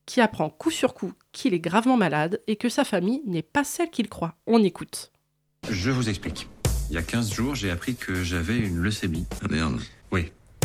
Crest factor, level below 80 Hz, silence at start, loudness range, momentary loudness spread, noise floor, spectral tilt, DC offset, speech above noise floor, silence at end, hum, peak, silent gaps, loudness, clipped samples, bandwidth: 18 dB; -40 dBFS; 0.05 s; 4 LU; 11 LU; -71 dBFS; -5 dB/octave; under 0.1%; 46 dB; 0 s; none; -8 dBFS; none; -26 LUFS; under 0.1%; 16 kHz